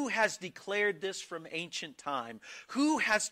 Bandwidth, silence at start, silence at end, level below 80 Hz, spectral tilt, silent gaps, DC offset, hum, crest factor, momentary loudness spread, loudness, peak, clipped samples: 15.5 kHz; 0 s; 0 s; -76 dBFS; -2.5 dB/octave; none; under 0.1%; none; 18 dB; 12 LU; -33 LUFS; -16 dBFS; under 0.1%